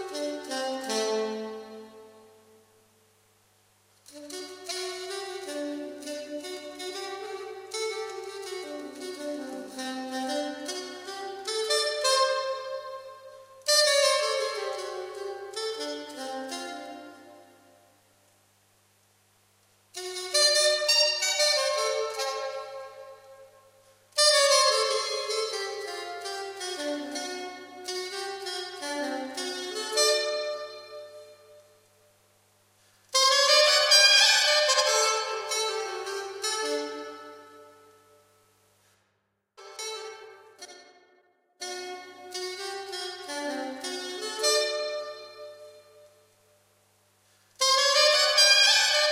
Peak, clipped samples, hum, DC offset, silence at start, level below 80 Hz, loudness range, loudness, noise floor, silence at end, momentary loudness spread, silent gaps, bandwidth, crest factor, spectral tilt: -8 dBFS; under 0.1%; 50 Hz at -75 dBFS; under 0.1%; 0 s; -84 dBFS; 20 LU; -25 LUFS; -75 dBFS; 0 s; 21 LU; none; 16 kHz; 22 dB; 1 dB/octave